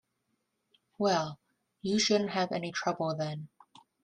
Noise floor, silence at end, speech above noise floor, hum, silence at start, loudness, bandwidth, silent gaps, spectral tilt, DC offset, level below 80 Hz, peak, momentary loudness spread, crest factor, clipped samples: -80 dBFS; 0.55 s; 49 dB; none; 1 s; -31 LUFS; 10.5 kHz; none; -4 dB/octave; under 0.1%; -74 dBFS; -14 dBFS; 13 LU; 18 dB; under 0.1%